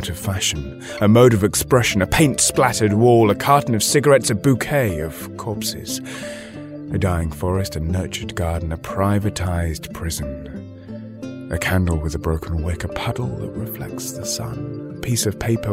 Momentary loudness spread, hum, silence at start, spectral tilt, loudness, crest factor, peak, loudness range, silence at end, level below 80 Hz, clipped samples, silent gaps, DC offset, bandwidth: 16 LU; none; 0 s; -5 dB/octave; -19 LUFS; 18 dB; 0 dBFS; 9 LU; 0 s; -36 dBFS; under 0.1%; none; under 0.1%; 16 kHz